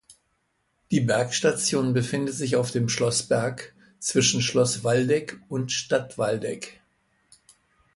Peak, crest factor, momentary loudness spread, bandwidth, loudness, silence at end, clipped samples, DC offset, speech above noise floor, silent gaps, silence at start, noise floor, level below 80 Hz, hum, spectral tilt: -8 dBFS; 18 dB; 10 LU; 11.5 kHz; -24 LUFS; 1.25 s; under 0.1%; under 0.1%; 48 dB; none; 0.1 s; -72 dBFS; -62 dBFS; none; -4 dB/octave